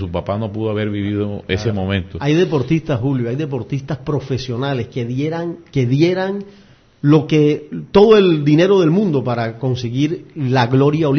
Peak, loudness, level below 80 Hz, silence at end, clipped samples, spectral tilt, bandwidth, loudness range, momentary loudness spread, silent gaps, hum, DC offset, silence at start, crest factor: 0 dBFS; -17 LUFS; -46 dBFS; 0 s; under 0.1%; -7.5 dB/octave; 6.6 kHz; 6 LU; 10 LU; none; none; under 0.1%; 0 s; 16 dB